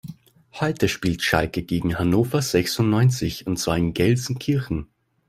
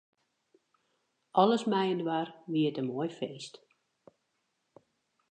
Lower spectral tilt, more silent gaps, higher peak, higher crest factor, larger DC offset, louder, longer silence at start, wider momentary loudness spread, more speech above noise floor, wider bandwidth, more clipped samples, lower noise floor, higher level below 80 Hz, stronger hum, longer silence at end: about the same, -5.5 dB/octave vs -6.5 dB/octave; neither; first, -4 dBFS vs -10 dBFS; about the same, 20 dB vs 24 dB; neither; first, -22 LUFS vs -31 LUFS; second, 0.05 s vs 1.35 s; second, 7 LU vs 14 LU; second, 21 dB vs 50 dB; first, 16 kHz vs 9.4 kHz; neither; second, -43 dBFS vs -80 dBFS; first, -44 dBFS vs -88 dBFS; neither; second, 0.45 s vs 1.85 s